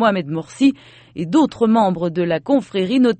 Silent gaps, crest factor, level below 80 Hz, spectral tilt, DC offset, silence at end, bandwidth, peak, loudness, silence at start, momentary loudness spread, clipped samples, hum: none; 14 dB; -58 dBFS; -6.5 dB/octave; under 0.1%; 0.05 s; 8.8 kHz; -2 dBFS; -18 LUFS; 0 s; 12 LU; under 0.1%; none